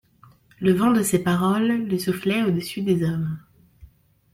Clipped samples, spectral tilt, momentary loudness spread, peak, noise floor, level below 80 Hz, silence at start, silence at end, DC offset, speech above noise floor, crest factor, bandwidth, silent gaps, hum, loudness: under 0.1%; -6 dB/octave; 6 LU; -6 dBFS; -54 dBFS; -56 dBFS; 0.6 s; 0.5 s; under 0.1%; 33 dB; 16 dB; 16.5 kHz; none; none; -22 LUFS